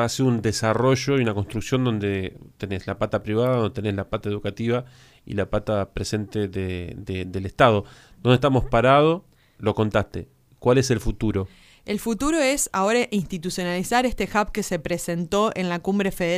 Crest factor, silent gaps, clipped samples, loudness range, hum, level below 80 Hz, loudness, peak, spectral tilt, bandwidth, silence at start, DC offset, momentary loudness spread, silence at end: 20 dB; none; under 0.1%; 5 LU; none; -42 dBFS; -23 LUFS; -2 dBFS; -5.5 dB/octave; 15.5 kHz; 0 s; under 0.1%; 11 LU; 0 s